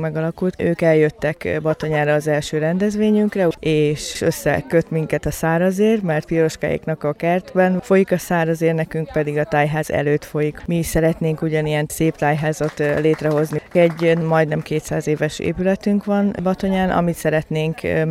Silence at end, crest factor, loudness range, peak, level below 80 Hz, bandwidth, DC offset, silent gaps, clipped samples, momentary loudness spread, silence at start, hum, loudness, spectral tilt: 0 s; 16 dB; 1 LU; -4 dBFS; -42 dBFS; 15.5 kHz; under 0.1%; none; under 0.1%; 5 LU; 0 s; none; -19 LUFS; -6.5 dB/octave